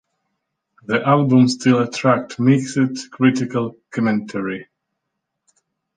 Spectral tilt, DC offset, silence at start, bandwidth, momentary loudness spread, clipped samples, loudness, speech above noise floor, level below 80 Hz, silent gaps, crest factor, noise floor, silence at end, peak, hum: -6.5 dB/octave; under 0.1%; 0.9 s; 9.4 kHz; 11 LU; under 0.1%; -18 LUFS; 60 dB; -62 dBFS; none; 18 dB; -78 dBFS; 1.35 s; -2 dBFS; none